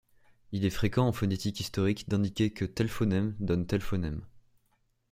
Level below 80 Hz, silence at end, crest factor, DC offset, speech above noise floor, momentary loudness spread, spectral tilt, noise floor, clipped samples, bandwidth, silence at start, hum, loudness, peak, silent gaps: -50 dBFS; 0.7 s; 18 dB; under 0.1%; 43 dB; 6 LU; -6.5 dB/octave; -72 dBFS; under 0.1%; 16 kHz; 0.5 s; none; -31 LUFS; -12 dBFS; none